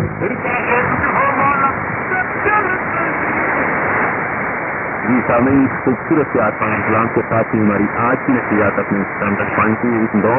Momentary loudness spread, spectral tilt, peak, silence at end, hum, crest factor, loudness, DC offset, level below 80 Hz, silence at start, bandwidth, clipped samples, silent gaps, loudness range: 5 LU; -13 dB/octave; -2 dBFS; 0 s; none; 14 dB; -16 LUFS; under 0.1%; -44 dBFS; 0 s; 3.1 kHz; under 0.1%; none; 1 LU